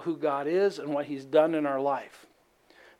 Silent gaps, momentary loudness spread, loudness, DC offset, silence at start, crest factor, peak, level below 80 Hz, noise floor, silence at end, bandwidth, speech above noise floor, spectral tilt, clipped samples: none; 8 LU; -28 LUFS; under 0.1%; 0 s; 18 dB; -10 dBFS; -80 dBFS; -61 dBFS; 0.85 s; 13 kHz; 33 dB; -6.5 dB/octave; under 0.1%